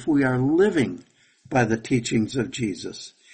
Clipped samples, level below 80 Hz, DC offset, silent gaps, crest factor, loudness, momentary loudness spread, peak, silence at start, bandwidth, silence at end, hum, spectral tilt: under 0.1%; -54 dBFS; under 0.1%; none; 16 dB; -23 LUFS; 14 LU; -8 dBFS; 0 s; 8.8 kHz; 0.25 s; none; -6 dB/octave